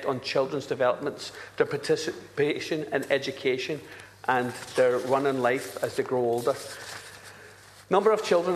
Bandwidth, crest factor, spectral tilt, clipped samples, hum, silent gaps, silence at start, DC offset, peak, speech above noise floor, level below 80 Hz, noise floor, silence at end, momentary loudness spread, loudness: 14 kHz; 20 dB; -4.5 dB/octave; under 0.1%; none; none; 0 s; under 0.1%; -8 dBFS; 23 dB; -70 dBFS; -50 dBFS; 0 s; 14 LU; -27 LUFS